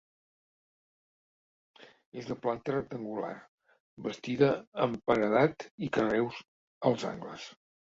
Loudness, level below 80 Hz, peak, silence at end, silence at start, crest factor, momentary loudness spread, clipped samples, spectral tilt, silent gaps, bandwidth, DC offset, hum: -31 LUFS; -66 dBFS; -10 dBFS; 0.4 s; 1.8 s; 22 dB; 17 LU; under 0.1%; -6.5 dB/octave; 2.06-2.12 s, 3.48-3.58 s, 3.80-3.97 s, 4.67-4.72 s, 5.71-5.78 s, 6.48-6.81 s; 7.8 kHz; under 0.1%; none